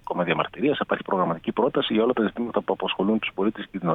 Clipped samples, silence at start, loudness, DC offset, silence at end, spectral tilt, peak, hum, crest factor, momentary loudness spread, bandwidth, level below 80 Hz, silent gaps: under 0.1%; 0.05 s; -25 LUFS; under 0.1%; 0 s; -8.5 dB/octave; -6 dBFS; none; 18 dB; 5 LU; 4.1 kHz; -58 dBFS; none